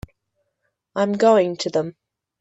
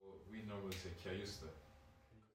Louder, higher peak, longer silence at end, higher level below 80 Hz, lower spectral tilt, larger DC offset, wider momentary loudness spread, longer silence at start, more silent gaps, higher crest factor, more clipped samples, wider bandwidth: first, -19 LUFS vs -50 LUFS; first, -4 dBFS vs -32 dBFS; first, 0.5 s vs 0.05 s; first, -56 dBFS vs -68 dBFS; about the same, -5.5 dB/octave vs -5 dB/octave; neither; second, 14 LU vs 19 LU; first, 0.95 s vs 0 s; neither; about the same, 18 dB vs 18 dB; neither; second, 8.2 kHz vs 16 kHz